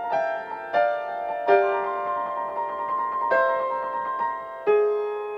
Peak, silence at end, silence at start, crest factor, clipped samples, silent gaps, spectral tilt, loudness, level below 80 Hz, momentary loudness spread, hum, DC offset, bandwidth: -6 dBFS; 0 s; 0 s; 20 dB; under 0.1%; none; -5.5 dB/octave; -25 LUFS; -68 dBFS; 8 LU; none; under 0.1%; 6 kHz